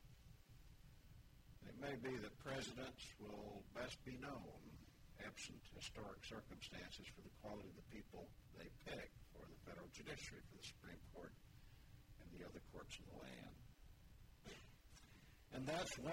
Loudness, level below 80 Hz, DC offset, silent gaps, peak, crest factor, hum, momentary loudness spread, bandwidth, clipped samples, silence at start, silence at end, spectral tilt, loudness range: -55 LUFS; -68 dBFS; under 0.1%; none; -34 dBFS; 20 dB; none; 17 LU; 16 kHz; under 0.1%; 0 s; 0 s; -4 dB/octave; 8 LU